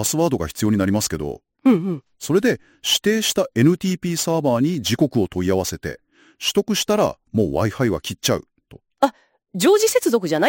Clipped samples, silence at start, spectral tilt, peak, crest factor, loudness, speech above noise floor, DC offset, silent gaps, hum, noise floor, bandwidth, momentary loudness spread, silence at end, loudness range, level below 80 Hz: under 0.1%; 0 s; -4.5 dB/octave; -2 dBFS; 18 dB; -20 LUFS; 29 dB; under 0.1%; none; none; -49 dBFS; 17 kHz; 8 LU; 0 s; 2 LU; -48 dBFS